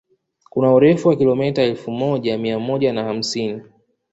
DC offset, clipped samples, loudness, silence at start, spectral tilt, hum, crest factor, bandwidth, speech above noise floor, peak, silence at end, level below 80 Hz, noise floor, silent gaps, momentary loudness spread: under 0.1%; under 0.1%; -18 LUFS; 0.55 s; -6.5 dB/octave; none; 16 dB; 8 kHz; 34 dB; -2 dBFS; 0.5 s; -58 dBFS; -52 dBFS; none; 11 LU